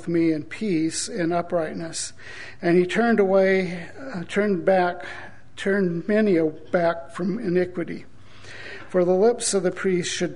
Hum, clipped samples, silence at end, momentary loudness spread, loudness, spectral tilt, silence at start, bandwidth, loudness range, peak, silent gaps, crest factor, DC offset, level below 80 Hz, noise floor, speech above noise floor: none; under 0.1%; 0 s; 16 LU; -23 LUFS; -5 dB/octave; 0 s; 11 kHz; 2 LU; -6 dBFS; none; 16 dB; 1%; -58 dBFS; -44 dBFS; 22 dB